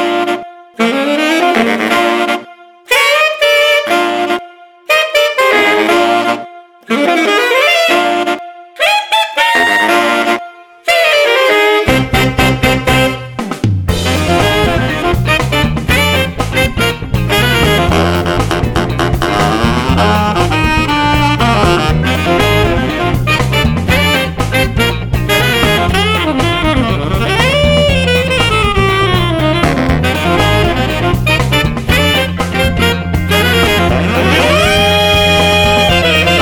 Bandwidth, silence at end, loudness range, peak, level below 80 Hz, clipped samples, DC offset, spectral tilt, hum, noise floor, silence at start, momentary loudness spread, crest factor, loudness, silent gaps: over 20 kHz; 0 s; 2 LU; 0 dBFS; -24 dBFS; under 0.1%; under 0.1%; -5 dB/octave; none; -35 dBFS; 0 s; 6 LU; 12 dB; -11 LUFS; none